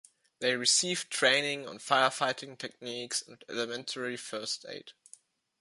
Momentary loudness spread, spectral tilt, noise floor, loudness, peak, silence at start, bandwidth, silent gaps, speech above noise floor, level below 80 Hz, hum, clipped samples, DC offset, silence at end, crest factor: 15 LU; -1 dB/octave; -60 dBFS; -30 LUFS; -10 dBFS; 0.4 s; 11.5 kHz; none; 28 dB; -82 dBFS; none; under 0.1%; under 0.1%; 0.7 s; 22 dB